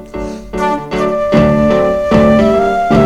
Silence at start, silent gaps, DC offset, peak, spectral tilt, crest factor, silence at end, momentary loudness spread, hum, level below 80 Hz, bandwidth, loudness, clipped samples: 0 s; none; under 0.1%; 0 dBFS; -7.5 dB/octave; 10 dB; 0 s; 11 LU; none; -30 dBFS; 12 kHz; -11 LUFS; under 0.1%